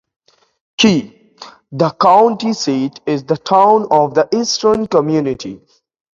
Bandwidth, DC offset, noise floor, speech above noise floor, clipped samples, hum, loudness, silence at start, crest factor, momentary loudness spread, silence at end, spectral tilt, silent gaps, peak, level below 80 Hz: 7.6 kHz; under 0.1%; -39 dBFS; 26 dB; under 0.1%; none; -14 LUFS; 0.8 s; 14 dB; 11 LU; 0.55 s; -5 dB/octave; none; 0 dBFS; -54 dBFS